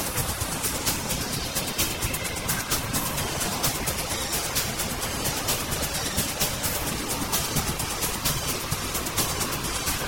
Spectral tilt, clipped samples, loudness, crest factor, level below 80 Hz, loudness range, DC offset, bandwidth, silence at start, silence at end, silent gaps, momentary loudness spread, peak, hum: -2.5 dB/octave; under 0.1%; -26 LUFS; 18 dB; -40 dBFS; 0 LU; 0.1%; 17 kHz; 0 s; 0 s; none; 3 LU; -10 dBFS; none